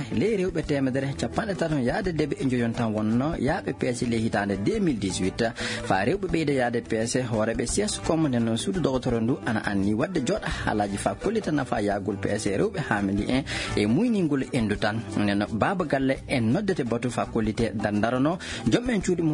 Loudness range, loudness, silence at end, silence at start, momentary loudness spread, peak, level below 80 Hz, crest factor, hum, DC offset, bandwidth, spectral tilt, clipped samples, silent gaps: 1 LU; -26 LUFS; 0 s; 0 s; 3 LU; -6 dBFS; -44 dBFS; 20 dB; none; under 0.1%; 11 kHz; -5.5 dB/octave; under 0.1%; none